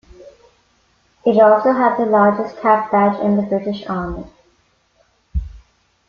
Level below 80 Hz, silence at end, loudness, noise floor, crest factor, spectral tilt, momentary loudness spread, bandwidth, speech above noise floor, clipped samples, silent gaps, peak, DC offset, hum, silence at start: -36 dBFS; 0.5 s; -16 LUFS; -60 dBFS; 16 dB; -8.5 dB/octave; 16 LU; 6.6 kHz; 45 dB; under 0.1%; none; -2 dBFS; under 0.1%; none; 0.2 s